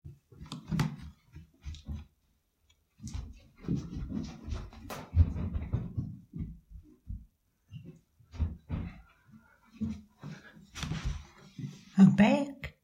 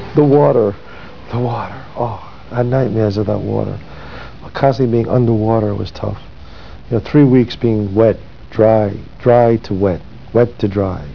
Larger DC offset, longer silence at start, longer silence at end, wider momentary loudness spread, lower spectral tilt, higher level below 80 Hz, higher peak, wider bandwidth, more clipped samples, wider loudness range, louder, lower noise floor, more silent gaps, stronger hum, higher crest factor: second, under 0.1% vs 2%; about the same, 0.05 s vs 0 s; about the same, 0.1 s vs 0 s; first, 24 LU vs 17 LU; second, -7.5 dB/octave vs -9.5 dB/octave; second, -44 dBFS vs -38 dBFS; second, -10 dBFS vs 0 dBFS; first, 12.5 kHz vs 5.4 kHz; neither; first, 13 LU vs 6 LU; second, -32 LUFS vs -15 LUFS; first, -74 dBFS vs -35 dBFS; neither; neither; first, 24 dB vs 16 dB